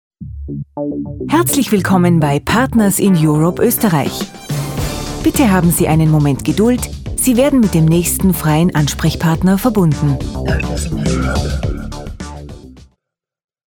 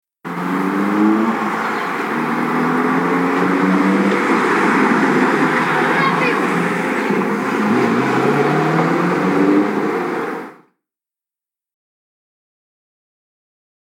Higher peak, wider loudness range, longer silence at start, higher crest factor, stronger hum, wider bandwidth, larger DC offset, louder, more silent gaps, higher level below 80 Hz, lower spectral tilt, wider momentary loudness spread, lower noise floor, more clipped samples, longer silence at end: about the same, 0 dBFS vs -2 dBFS; about the same, 5 LU vs 6 LU; about the same, 0.2 s vs 0.25 s; about the same, 14 dB vs 16 dB; neither; first, over 20 kHz vs 17 kHz; neither; about the same, -14 LUFS vs -16 LUFS; neither; first, -28 dBFS vs -74 dBFS; about the same, -5.5 dB/octave vs -6.5 dB/octave; first, 14 LU vs 6 LU; second, -74 dBFS vs -88 dBFS; neither; second, 0.95 s vs 3.35 s